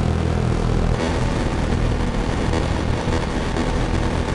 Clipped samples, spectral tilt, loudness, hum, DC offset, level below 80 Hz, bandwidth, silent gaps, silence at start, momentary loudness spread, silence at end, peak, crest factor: under 0.1%; -6.5 dB/octave; -22 LUFS; none; under 0.1%; -26 dBFS; 11.5 kHz; none; 0 s; 2 LU; 0 s; -8 dBFS; 12 dB